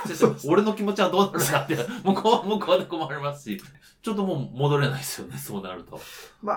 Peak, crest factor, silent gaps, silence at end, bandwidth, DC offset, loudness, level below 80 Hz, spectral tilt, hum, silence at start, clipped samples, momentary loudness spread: -4 dBFS; 22 dB; none; 0 s; 19 kHz; under 0.1%; -25 LUFS; -64 dBFS; -5 dB/octave; none; 0 s; under 0.1%; 15 LU